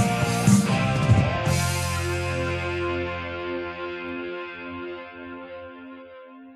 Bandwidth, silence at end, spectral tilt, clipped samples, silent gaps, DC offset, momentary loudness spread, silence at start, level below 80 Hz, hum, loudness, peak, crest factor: 14.5 kHz; 0 s; -5.5 dB/octave; under 0.1%; none; under 0.1%; 20 LU; 0 s; -42 dBFS; none; -25 LUFS; -6 dBFS; 20 dB